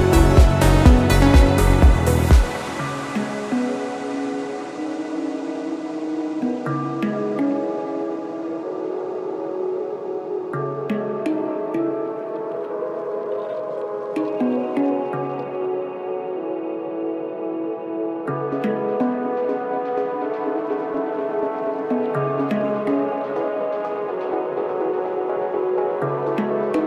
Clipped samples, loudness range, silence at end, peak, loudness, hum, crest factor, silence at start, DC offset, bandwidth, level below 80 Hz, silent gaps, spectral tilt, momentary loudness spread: under 0.1%; 8 LU; 0 s; 0 dBFS; -22 LUFS; none; 20 dB; 0 s; under 0.1%; 15.5 kHz; -26 dBFS; none; -7 dB/octave; 12 LU